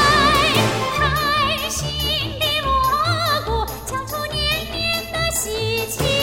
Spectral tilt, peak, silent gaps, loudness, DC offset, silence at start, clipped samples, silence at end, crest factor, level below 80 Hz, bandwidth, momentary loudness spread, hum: -3 dB/octave; -2 dBFS; none; -19 LUFS; under 0.1%; 0 s; under 0.1%; 0 s; 16 dB; -32 dBFS; 16.5 kHz; 9 LU; none